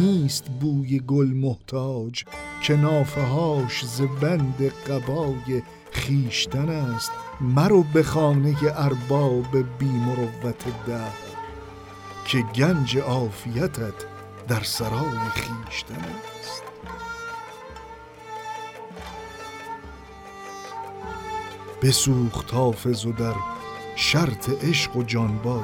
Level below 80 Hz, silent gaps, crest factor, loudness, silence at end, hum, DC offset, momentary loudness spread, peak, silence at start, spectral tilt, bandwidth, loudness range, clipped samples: -48 dBFS; none; 20 dB; -24 LUFS; 0 s; none; under 0.1%; 17 LU; -6 dBFS; 0 s; -5.5 dB/octave; 17 kHz; 14 LU; under 0.1%